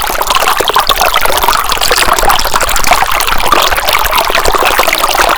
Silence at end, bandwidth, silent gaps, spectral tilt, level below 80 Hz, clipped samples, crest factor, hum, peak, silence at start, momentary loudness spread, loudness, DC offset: 0 s; over 20 kHz; none; -1 dB/octave; -22 dBFS; 2%; 8 dB; none; 0 dBFS; 0 s; 2 LU; -8 LUFS; under 0.1%